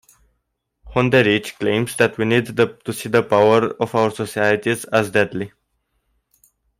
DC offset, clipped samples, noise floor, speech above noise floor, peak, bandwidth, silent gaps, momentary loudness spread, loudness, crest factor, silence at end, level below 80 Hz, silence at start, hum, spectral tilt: under 0.1%; under 0.1%; -73 dBFS; 56 dB; -2 dBFS; 16 kHz; none; 7 LU; -18 LUFS; 18 dB; 1.3 s; -52 dBFS; 0.85 s; none; -5.5 dB/octave